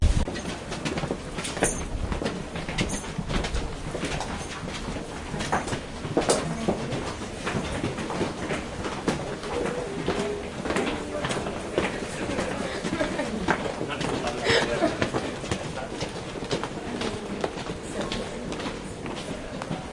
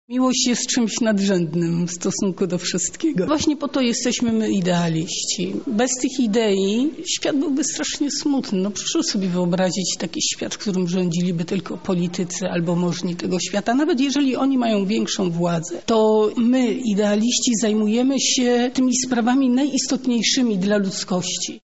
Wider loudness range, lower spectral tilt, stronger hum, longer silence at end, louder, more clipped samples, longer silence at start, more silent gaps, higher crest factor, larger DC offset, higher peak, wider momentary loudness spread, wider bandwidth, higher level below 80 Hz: about the same, 5 LU vs 4 LU; about the same, -4.5 dB/octave vs -4 dB/octave; neither; about the same, 0 s vs 0.05 s; second, -29 LUFS vs -20 LUFS; neither; about the same, 0 s vs 0.1 s; neither; first, 24 dB vs 14 dB; second, under 0.1% vs 0.5%; about the same, -6 dBFS vs -6 dBFS; first, 8 LU vs 5 LU; first, 11.5 kHz vs 8.2 kHz; first, -38 dBFS vs -58 dBFS